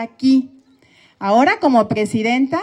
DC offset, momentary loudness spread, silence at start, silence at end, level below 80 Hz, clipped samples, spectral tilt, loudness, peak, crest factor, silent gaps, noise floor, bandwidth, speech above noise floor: under 0.1%; 7 LU; 0 s; 0 s; -60 dBFS; under 0.1%; -6 dB/octave; -16 LUFS; -2 dBFS; 14 dB; none; -52 dBFS; 11 kHz; 37 dB